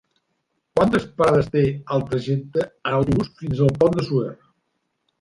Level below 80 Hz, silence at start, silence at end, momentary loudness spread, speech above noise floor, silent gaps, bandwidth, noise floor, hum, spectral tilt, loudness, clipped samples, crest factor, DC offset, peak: -46 dBFS; 0.75 s; 0.85 s; 7 LU; 53 dB; none; 11.5 kHz; -73 dBFS; none; -8 dB/octave; -21 LUFS; under 0.1%; 18 dB; under 0.1%; -4 dBFS